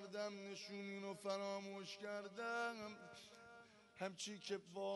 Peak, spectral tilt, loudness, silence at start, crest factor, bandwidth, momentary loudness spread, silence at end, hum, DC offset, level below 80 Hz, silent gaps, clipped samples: -30 dBFS; -3.5 dB/octave; -48 LUFS; 0 s; 20 dB; 11.5 kHz; 15 LU; 0 s; none; under 0.1%; under -90 dBFS; none; under 0.1%